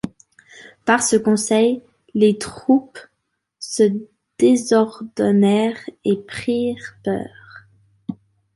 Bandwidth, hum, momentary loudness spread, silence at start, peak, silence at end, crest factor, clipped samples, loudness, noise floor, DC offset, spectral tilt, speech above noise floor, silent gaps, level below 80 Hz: 11.5 kHz; none; 15 LU; 0.05 s; -2 dBFS; 0.4 s; 18 dB; under 0.1%; -19 LUFS; -72 dBFS; under 0.1%; -5 dB/octave; 54 dB; none; -58 dBFS